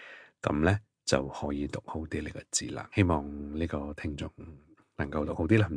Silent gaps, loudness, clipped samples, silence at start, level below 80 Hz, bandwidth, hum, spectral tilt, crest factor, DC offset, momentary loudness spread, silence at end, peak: none; -32 LUFS; under 0.1%; 0 s; -46 dBFS; 10.5 kHz; none; -5.5 dB/octave; 22 dB; under 0.1%; 11 LU; 0 s; -8 dBFS